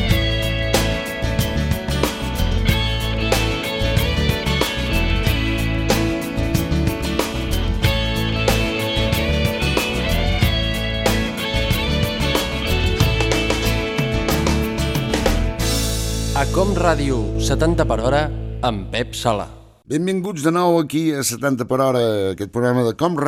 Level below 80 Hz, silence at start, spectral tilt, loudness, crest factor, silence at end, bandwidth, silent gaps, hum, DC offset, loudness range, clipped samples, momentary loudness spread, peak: -26 dBFS; 0 s; -5 dB/octave; -19 LUFS; 18 dB; 0 s; 17 kHz; none; none; under 0.1%; 1 LU; under 0.1%; 4 LU; -2 dBFS